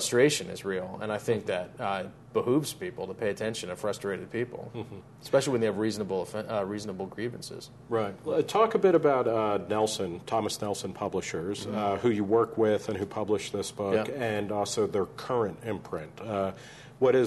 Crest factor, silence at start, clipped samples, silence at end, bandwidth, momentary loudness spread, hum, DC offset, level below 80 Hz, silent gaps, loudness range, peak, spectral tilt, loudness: 18 dB; 0 s; under 0.1%; 0 s; 12.5 kHz; 11 LU; none; under 0.1%; -64 dBFS; none; 4 LU; -10 dBFS; -5 dB/octave; -29 LUFS